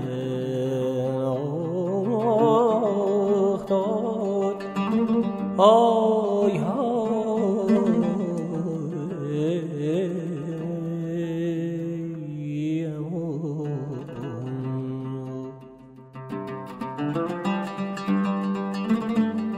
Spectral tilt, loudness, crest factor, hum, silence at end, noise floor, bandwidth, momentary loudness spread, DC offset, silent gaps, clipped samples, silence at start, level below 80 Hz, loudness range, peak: -8 dB/octave; -25 LUFS; 20 dB; none; 0 s; -46 dBFS; 10 kHz; 12 LU; under 0.1%; none; under 0.1%; 0 s; -64 dBFS; 10 LU; -4 dBFS